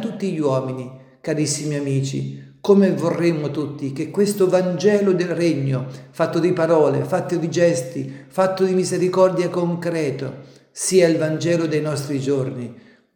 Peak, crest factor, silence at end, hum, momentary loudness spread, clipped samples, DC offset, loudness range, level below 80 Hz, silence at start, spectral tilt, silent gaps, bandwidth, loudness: -2 dBFS; 18 dB; 0.4 s; none; 13 LU; under 0.1%; under 0.1%; 2 LU; -68 dBFS; 0 s; -6 dB/octave; none; 18.5 kHz; -20 LUFS